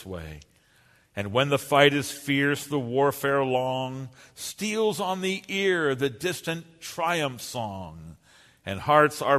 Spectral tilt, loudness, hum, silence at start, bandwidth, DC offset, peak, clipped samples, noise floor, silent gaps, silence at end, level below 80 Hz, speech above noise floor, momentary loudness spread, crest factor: -4.5 dB/octave; -25 LUFS; none; 0 s; 13.5 kHz; under 0.1%; -4 dBFS; under 0.1%; -61 dBFS; none; 0 s; -58 dBFS; 35 dB; 18 LU; 24 dB